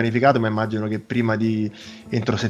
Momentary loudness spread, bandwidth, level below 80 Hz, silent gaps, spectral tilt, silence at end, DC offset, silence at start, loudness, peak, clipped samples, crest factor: 10 LU; 9 kHz; -58 dBFS; none; -7 dB/octave; 0 s; under 0.1%; 0 s; -22 LUFS; -2 dBFS; under 0.1%; 18 dB